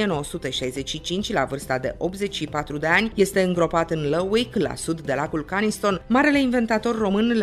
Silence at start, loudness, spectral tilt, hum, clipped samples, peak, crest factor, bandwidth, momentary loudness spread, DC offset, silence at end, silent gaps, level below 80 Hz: 0 s; -23 LUFS; -5 dB/octave; none; under 0.1%; -6 dBFS; 16 dB; 14 kHz; 8 LU; under 0.1%; 0 s; none; -44 dBFS